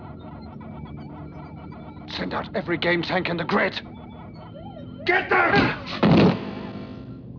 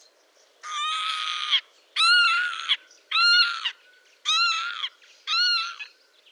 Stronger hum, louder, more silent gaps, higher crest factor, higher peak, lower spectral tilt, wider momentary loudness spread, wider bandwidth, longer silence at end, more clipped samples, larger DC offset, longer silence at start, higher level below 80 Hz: neither; about the same, -22 LUFS vs -22 LUFS; neither; about the same, 20 dB vs 16 dB; first, -4 dBFS vs -8 dBFS; first, -7.5 dB/octave vs 8.5 dB/octave; first, 21 LU vs 16 LU; second, 5.4 kHz vs 12 kHz; second, 0 s vs 0.45 s; neither; neither; second, 0 s vs 0.65 s; first, -48 dBFS vs under -90 dBFS